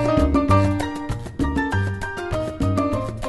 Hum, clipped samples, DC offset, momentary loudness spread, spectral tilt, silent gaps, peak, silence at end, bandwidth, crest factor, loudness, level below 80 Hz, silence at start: none; under 0.1%; under 0.1%; 9 LU; -7 dB/octave; none; -4 dBFS; 0 s; 12 kHz; 16 dB; -22 LUFS; -32 dBFS; 0 s